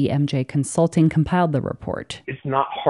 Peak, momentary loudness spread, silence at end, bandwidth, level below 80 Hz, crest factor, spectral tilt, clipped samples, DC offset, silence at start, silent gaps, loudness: -4 dBFS; 12 LU; 0 s; 11.5 kHz; -48 dBFS; 18 dB; -6.5 dB/octave; under 0.1%; under 0.1%; 0 s; none; -21 LUFS